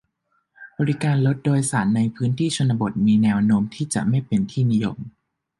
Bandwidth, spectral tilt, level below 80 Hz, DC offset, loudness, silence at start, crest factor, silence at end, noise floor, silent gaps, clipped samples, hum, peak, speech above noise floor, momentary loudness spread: 11.5 kHz; -6.5 dB/octave; -54 dBFS; under 0.1%; -21 LUFS; 0.6 s; 14 dB; 0.5 s; -70 dBFS; none; under 0.1%; none; -8 dBFS; 50 dB; 7 LU